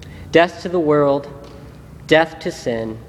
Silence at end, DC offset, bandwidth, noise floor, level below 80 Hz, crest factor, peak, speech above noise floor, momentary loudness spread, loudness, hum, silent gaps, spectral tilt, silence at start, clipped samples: 0 s; under 0.1%; 13 kHz; -38 dBFS; -46 dBFS; 18 dB; 0 dBFS; 21 dB; 21 LU; -17 LUFS; none; none; -5.5 dB/octave; 0 s; under 0.1%